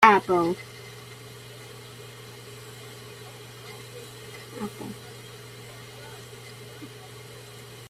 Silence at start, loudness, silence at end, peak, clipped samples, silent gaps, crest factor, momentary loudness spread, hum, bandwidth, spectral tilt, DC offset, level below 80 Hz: 0 s; -32 LUFS; 0 s; -2 dBFS; under 0.1%; none; 28 dB; 15 LU; none; 16 kHz; -4.5 dB/octave; under 0.1%; -64 dBFS